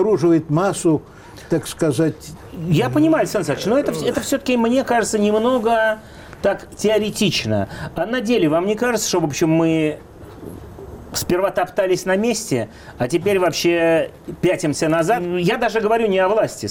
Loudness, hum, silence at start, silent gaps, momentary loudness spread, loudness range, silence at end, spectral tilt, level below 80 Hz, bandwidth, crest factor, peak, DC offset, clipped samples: -19 LUFS; none; 0 s; none; 10 LU; 2 LU; 0 s; -5 dB/octave; -48 dBFS; 17 kHz; 12 dB; -8 dBFS; under 0.1%; under 0.1%